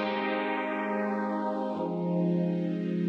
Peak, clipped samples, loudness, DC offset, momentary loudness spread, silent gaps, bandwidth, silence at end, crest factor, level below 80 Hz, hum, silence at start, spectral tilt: -18 dBFS; under 0.1%; -30 LUFS; under 0.1%; 4 LU; none; 5.6 kHz; 0 s; 12 dB; -78 dBFS; none; 0 s; -9 dB/octave